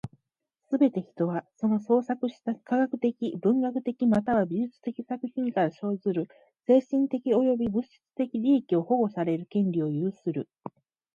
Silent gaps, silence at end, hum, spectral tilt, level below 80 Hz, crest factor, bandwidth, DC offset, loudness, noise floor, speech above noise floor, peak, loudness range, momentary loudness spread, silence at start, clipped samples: none; 0.45 s; none; -9.5 dB/octave; -68 dBFS; 16 dB; 7 kHz; under 0.1%; -27 LUFS; -82 dBFS; 55 dB; -10 dBFS; 2 LU; 10 LU; 0.05 s; under 0.1%